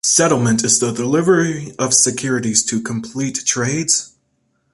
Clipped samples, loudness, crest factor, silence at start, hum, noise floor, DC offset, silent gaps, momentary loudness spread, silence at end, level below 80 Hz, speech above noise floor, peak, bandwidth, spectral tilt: under 0.1%; -16 LUFS; 18 dB; 0.05 s; none; -65 dBFS; under 0.1%; none; 9 LU; 0.65 s; -56 dBFS; 49 dB; 0 dBFS; 11.5 kHz; -3 dB/octave